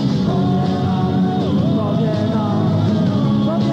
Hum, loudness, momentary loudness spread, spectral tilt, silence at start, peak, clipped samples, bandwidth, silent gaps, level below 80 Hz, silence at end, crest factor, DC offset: none; -17 LUFS; 1 LU; -8.5 dB/octave; 0 s; -6 dBFS; under 0.1%; 8 kHz; none; -44 dBFS; 0 s; 10 dB; under 0.1%